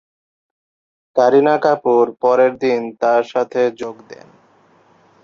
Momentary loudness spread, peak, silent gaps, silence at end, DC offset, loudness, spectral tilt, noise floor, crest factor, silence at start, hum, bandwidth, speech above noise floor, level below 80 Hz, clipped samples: 7 LU; -2 dBFS; none; 1.1 s; under 0.1%; -16 LUFS; -6 dB/octave; -53 dBFS; 16 dB; 1.15 s; none; 7 kHz; 37 dB; -66 dBFS; under 0.1%